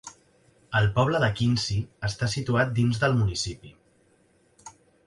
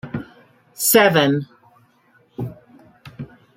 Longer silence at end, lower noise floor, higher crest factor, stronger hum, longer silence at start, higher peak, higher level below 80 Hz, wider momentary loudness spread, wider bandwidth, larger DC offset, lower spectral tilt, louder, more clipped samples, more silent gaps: about the same, 0.35 s vs 0.3 s; first, -63 dBFS vs -57 dBFS; about the same, 18 dB vs 20 dB; neither; about the same, 0.05 s vs 0.05 s; second, -8 dBFS vs -2 dBFS; first, -48 dBFS vs -58 dBFS; second, 9 LU vs 25 LU; second, 11.5 kHz vs 16.5 kHz; neither; first, -5.5 dB/octave vs -3.5 dB/octave; second, -25 LUFS vs -16 LUFS; neither; neither